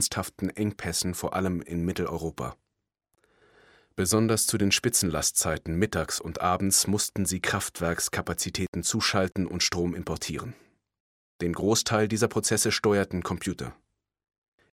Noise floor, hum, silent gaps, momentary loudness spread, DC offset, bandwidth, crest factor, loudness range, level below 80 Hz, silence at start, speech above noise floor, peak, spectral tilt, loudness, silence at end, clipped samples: -79 dBFS; none; 8.68-8.73 s, 11.00-11.39 s; 10 LU; under 0.1%; 17 kHz; 20 dB; 6 LU; -50 dBFS; 0 s; 52 dB; -8 dBFS; -3.5 dB/octave; -27 LUFS; 1 s; under 0.1%